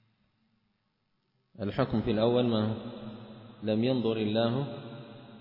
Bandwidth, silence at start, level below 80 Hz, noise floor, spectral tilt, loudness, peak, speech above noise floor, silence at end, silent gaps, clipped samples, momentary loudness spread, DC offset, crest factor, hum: 5.6 kHz; 1.6 s; -58 dBFS; -77 dBFS; -10 dB/octave; -30 LUFS; -14 dBFS; 48 dB; 0 s; none; under 0.1%; 19 LU; under 0.1%; 18 dB; none